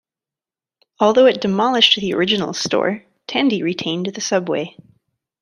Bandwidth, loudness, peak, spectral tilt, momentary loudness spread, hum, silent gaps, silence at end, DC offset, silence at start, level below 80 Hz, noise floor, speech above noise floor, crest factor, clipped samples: 11 kHz; -17 LUFS; 0 dBFS; -4 dB/octave; 11 LU; none; none; 0.7 s; under 0.1%; 1 s; -60 dBFS; under -90 dBFS; over 73 dB; 18 dB; under 0.1%